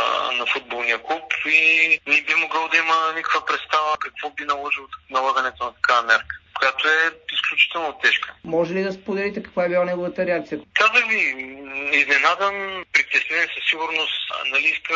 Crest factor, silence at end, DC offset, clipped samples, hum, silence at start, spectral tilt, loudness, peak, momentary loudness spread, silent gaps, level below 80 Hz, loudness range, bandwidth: 18 dB; 0 s; under 0.1%; under 0.1%; none; 0 s; -2.5 dB/octave; -19 LUFS; -2 dBFS; 10 LU; none; -60 dBFS; 4 LU; 7.6 kHz